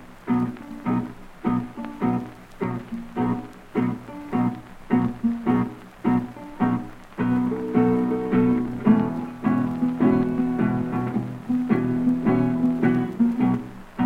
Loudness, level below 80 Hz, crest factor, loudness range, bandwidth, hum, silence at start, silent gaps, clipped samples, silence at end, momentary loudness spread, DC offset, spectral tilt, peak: -24 LUFS; -48 dBFS; 18 dB; 6 LU; 5 kHz; none; 0 s; none; under 0.1%; 0 s; 10 LU; under 0.1%; -9 dB/octave; -6 dBFS